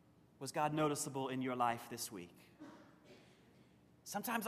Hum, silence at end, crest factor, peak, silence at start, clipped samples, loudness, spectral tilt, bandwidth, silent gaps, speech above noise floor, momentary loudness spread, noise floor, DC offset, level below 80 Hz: none; 0 s; 20 dB; -22 dBFS; 0.4 s; under 0.1%; -40 LUFS; -4 dB/octave; 15 kHz; none; 27 dB; 21 LU; -67 dBFS; under 0.1%; -80 dBFS